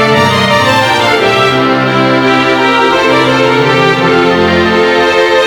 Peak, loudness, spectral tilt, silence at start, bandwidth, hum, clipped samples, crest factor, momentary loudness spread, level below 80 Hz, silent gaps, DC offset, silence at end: 0 dBFS; -8 LUFS; -5 dB/octave; 0 s; over 20 kHz; none; under 0.1%; 8 dB; 1 LU; -40 dBFS; none; under 0.1%; 0 s